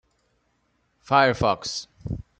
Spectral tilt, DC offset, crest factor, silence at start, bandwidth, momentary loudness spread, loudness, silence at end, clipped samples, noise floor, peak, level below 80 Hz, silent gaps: -4.5 dB/octave; under 0.1%; 22 dB; 1.1 s; 9 kHz; 16 LU; -23 LUFS; 0.2 s; under 0.1%; -69 dBFS; -4 dBFS; -48 dBFS; none